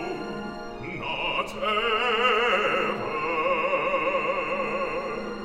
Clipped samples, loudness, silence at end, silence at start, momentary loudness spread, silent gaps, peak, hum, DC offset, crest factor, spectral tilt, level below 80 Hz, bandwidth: under 0.1%; -25 LUFS; 0 s; 0 s; 11 LU; none; -10 dBFS; none; under 0.1%; 16 dB; -4.5 dB/octave; -50 dBFS; 14 kHz